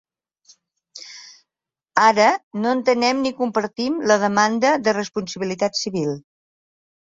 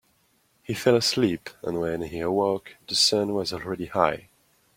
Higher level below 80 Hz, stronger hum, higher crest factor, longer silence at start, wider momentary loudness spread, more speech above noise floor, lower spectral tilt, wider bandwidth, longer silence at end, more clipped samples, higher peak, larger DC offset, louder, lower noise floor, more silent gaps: second, -64 dBFS vs -58 dBFS; neither; about the same, 20 dB vs 22 dB; first, 0.95 s vs 0.7 s; first, 18 LU vs 12 LU; first, 69 dB vs 41 dB; about the same, -4 dB/octave vs -4 dB/octave; second, 7.8 kHz vs 16.5 kHz; first, 0.9 s vs 0.55 s; neither; about the same, -2 dBFS vs -4 dBFS; neither; first, -20 LUFS vs -25 LUFS; first, -88 dBFS vs -66 dBFS; first, 2.43-2.51 s vs none